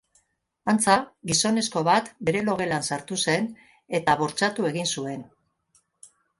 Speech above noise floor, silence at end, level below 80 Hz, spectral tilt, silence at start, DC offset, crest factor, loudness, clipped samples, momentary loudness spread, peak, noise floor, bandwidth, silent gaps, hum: 44 dB; 1.15 s; -62 dBFS; -3.5 dB/octave; 0.65 s; under 0.1%; 22 dB; -24 LUFS; under 0.1%; 9 LU; -4 dBFS; -69 dBFS; 11.5 kHz; none; none